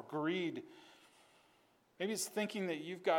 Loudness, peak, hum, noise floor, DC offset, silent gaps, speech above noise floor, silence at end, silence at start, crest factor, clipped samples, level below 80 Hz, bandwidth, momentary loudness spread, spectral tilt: -40 LUFS; -20 dBFS; none; -72 dBFS; under 0.1%; none; 33 dB; 0 s; 0 s; 20 dB; under 0.1%; under -90 dBFS; 19 kHz; 20 LU; -4 dB/octave